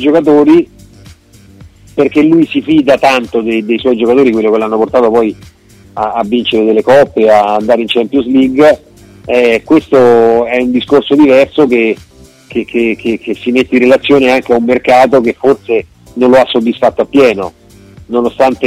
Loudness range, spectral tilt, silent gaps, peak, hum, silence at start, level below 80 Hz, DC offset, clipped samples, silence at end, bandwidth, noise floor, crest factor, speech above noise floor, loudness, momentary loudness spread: 3 LU; -6 dB/octave; none; 0 dBFS; none; 0 s; -44 dBFS; under 0.1%; 0.1%; 0 s; 14 kHz; -39 dBFS; 10 dB; 30 dB; -9 LUFS; 9 LU